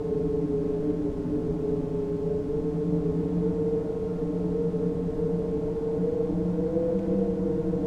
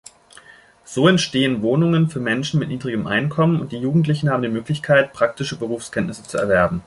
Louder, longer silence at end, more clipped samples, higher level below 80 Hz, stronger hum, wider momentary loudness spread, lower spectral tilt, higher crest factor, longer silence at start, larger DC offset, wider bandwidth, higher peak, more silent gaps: second, -28 LUFS vs -19 LUFS; about the same, 0 s vs 0.05 s; neither; first, -42 dBFS vs -50 dBFS; neither; second, 3 LU vs 9 LU; first, -10.5 dB/octave vs -6 dB/octave; second, 12 dB vs 18 dB; second, 0 s vs 0.9 s; neither; second, 7 kHz vs 11.5 kHz; second, -14 dBFS vs -2 dBFS; neither